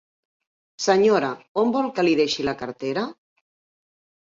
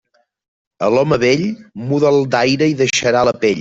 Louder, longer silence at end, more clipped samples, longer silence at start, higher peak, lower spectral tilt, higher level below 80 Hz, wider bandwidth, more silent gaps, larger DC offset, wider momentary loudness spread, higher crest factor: second, -22 LUFS vs -15 LUFS; first, 1.2 s vs 0 s; neither; about the same, 0.8 s vs 0.8 s; second, -6 dBFS vs -2 dBFS; about the same, -4.5 dB/octave vs -5 dB/octave; second, -62 dBFS vs -50 dBFS; about the same, 7.8 kHz vs 8 kHz; first, 1.48-1.55 s vs none; neither; first, 10 LU vs 7 LU; about the same, 18 dB vs 14 dB